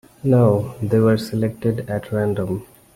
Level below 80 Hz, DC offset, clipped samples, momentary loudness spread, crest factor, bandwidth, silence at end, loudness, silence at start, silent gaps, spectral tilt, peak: -50 dBFS; under 0.1%; under 0.1%; 9 LU; 16 dB; 15.5 kHz; 0.3 s; -20 LUFS; 0.25 s; none; -8.5 dB/octave; -2 dBFS